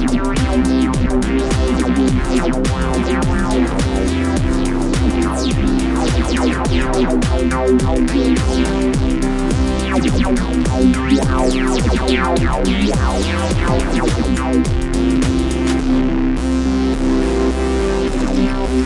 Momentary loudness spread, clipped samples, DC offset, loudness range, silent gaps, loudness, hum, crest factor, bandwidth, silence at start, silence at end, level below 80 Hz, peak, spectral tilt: 3 LU; under 0.1%; under 0.1%; 1 LU; none; -16 LUFS; none; 14 dB; 11.5 kHz; 0 s; 0 s; -20 dBFS; 0 dBFS; -6 dB/octave